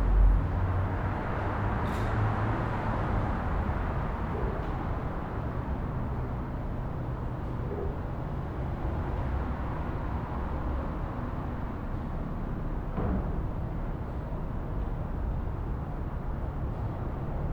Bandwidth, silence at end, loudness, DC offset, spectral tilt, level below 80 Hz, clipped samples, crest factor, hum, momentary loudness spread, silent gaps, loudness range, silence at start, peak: 5.4 kHz; 0 s; -33 LUFS; under 0.1%; -9 dB/octave; -34 dBFS; under 0.1%; 18 dB; none; 6 LU; none; 4 LU; 0 s; -14 dBFS